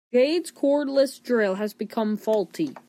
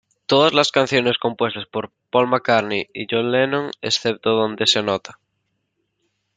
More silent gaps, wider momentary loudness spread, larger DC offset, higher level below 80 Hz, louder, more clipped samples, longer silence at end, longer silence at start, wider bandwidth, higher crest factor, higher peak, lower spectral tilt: neither; about the same, 7 LU vs 9 LU; neither; second, -80 dBFS vs -64 dBFS; second, -24 LUFS vs -19 LUFS; neither; second, 0.1 s vs 1.25 s; second, 0.15 s vs 0.3 s; first, 15.5 kHz vs 9.4 kHz; about the same, 14 dB vs 18 dB; second, -10 dBFS vs -2 dBFS; about the same, -5 dB/octave vs -4 dB/octave